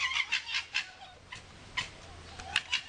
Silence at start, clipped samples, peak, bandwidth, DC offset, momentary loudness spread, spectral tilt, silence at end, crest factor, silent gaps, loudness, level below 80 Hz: 0 s; under 0.1%; -12 dBFS; 10 kHz; under 0.1%; 17 LU; 0 dB/octave; 0 s; 24 dB; none; -33 LUFS; -60 dBFS